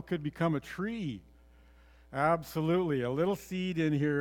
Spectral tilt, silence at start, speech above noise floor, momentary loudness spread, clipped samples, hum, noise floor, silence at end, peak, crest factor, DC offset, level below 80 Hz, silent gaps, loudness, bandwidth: -7 dB/octave; 0 s; 27 dB; 9 LU; under 0.1%; none; -59 dBFS; 0 s; -14 dBFS; 18 dB; under 0.1%; -60 dBFS; none; -32 LUFS; 19 kHz